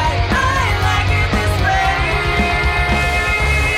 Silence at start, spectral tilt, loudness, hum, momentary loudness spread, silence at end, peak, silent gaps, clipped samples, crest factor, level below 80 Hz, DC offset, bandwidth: 0 s; -5 dB/octave; -15 LUFS; none; 1 LU; 0 s; -6 dBFS; none; under 0.1%; 10 dB; -22 dBFS; under 0.1%; 15 kHz